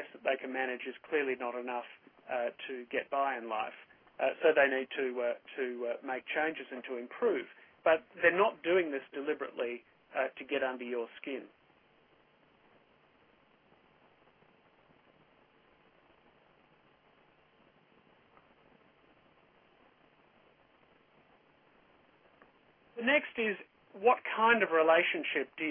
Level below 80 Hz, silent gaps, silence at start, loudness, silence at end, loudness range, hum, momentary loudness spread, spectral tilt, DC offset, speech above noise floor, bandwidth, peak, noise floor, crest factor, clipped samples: -80 dBFS; none; 0 s; -33 LUFS; 0 s; 10 LU; none; 15 LU; -7 dB/octave; under 0.1%; 34 dB; 3.6 kHz; -12 dBFS; -67 dBFS; 24 dB; under 0.1%